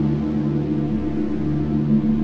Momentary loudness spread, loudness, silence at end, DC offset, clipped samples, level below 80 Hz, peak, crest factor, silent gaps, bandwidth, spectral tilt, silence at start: 4 LU; -22 LUFS; 0 s; under 0.1%; under 0.1%; -36 dBFS; -8 dBFS; 12 dB; none; 5.8 kHz; -10.5 dB/octave; 0 s